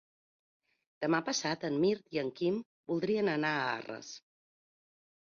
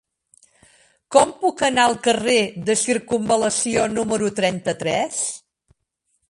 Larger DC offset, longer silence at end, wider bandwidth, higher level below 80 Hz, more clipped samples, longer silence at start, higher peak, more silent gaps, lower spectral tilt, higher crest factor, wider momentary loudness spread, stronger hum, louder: neither; first, 1.15 s vs 0.9 s; second, 7.4 kHz vs 11.5 kHz; second, -76 dBFS vs -56 dBFS; neither; about the same, 1 s vs 1.1 s; second, -18 dBFS vs 0 dBFS; first, 2.66-2.84 s vs none; first, -4.5 dB/octave vs -3 dB/octave; about the same, 18 dB vs 20 dB; first, 11 LU vs 6 LU; neither; second, -33 LUFS vs -20 LUFS